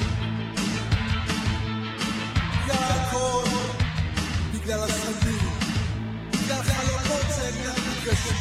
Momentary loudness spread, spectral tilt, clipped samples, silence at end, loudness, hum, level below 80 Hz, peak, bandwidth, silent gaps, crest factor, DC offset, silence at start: 4 LU; -4.5 dB/octave; under 0.1%; 0 s; -26 LUFS; none; -36 dBFS; -8 dBFS; 15.5 kHz; none; 16 dB; under 0.1%; 0 s